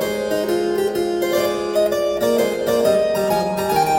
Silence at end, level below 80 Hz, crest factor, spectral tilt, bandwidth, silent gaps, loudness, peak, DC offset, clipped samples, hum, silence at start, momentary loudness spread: 0 s; -50 dBFS; 14 dB; -4.5 dB/octave; 17 kHz; none; -19 LUFS; -6 dBFS; under 0.1%; under 0.1%; none; 0 s; 3 LU